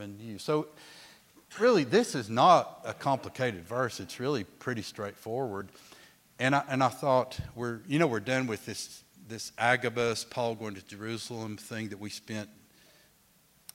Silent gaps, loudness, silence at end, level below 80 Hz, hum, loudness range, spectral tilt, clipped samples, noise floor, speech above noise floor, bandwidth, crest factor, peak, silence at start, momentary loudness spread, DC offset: none; -30 LUFS; 1.25 s; -66 dBFS; none; 8 LU; -5 dB/octave; under 0.1%; -65 dBFS; 34 dB; 16.5 kHz; 22 dB; -10 dBFS; 0 s; 16 LU; under 0.1%